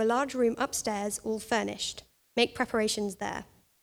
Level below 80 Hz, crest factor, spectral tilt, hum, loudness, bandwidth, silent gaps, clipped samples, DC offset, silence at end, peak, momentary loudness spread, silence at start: -62 dBFS; 20 dB; -3 dB/octave; none; -30 LUFS; over 20 kHz; none; under 0.1%; under 0.1%; 0.4 s; -10 dBFS; 9 LU; 0 s